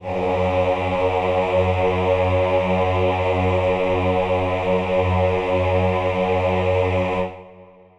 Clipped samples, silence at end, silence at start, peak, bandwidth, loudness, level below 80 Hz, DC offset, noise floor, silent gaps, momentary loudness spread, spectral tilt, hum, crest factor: under 0.1%; 0.35 s; 0 s; -6 dBFS; 9 kHz; -20 LUFS; -42 dBFS; under 0.1%; -46 dBFS; none; 2 LU; -7.5 dB/octave; none; 14 dB